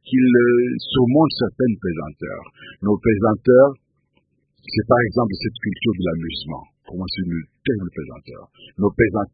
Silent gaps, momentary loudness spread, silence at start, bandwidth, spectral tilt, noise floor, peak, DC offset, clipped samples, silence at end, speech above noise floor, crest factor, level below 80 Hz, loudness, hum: none; 18 LU; 0.05 s; 5 kHz; -12 dB/octave; -66 dBFS; -2 dBFS; under 0.1%; under 0.1%; 0.05 s; 47 dB; 18 dB; -46 dBFS; -19 LUFS; none